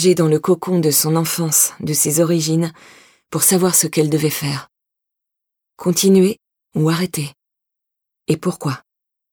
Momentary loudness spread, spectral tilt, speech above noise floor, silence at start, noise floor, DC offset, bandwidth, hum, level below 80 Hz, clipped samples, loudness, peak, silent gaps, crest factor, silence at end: 13 LU; -4.5 dB/octave; 65 dB; 0 s; -81 dBFS; under 0.1%; 20 kHz; none; -62 dBFS; under 0.1%; -16 LUFS; -2 dBFS; none; 16 dB; 0.55 s